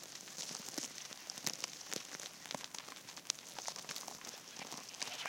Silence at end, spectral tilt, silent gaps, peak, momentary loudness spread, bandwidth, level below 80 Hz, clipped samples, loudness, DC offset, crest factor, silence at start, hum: 0 s; -0.5 dB/octave; none; -10 dBFS; 7 LU; 17 kHz; -88 dBFS; under 0.1%; -44 LUFS; under 0.1%; 38 dB; 0 s; none